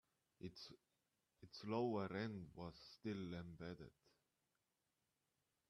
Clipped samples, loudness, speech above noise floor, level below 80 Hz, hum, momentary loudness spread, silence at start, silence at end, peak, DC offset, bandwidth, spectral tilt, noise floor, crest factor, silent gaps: under 0.1%; -50 LUFS; 41 dB; -78 dBFS; none; 17 LU; 0.4 s; 1.8 s; -30 dBFS; under 0.1%; 13 kHz; -7 dB/octave; -90 dBFS; 22 dB; none